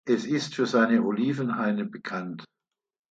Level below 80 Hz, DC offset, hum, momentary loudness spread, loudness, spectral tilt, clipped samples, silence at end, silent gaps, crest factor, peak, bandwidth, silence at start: -74 dBFS; under 0.1%; none; 12 LU; -26 LUFS; -6 dB/octave; under 0.1%; 0.65 s; none; 18 dB; -10 dBFS; 7.8 kHz; 0.05 s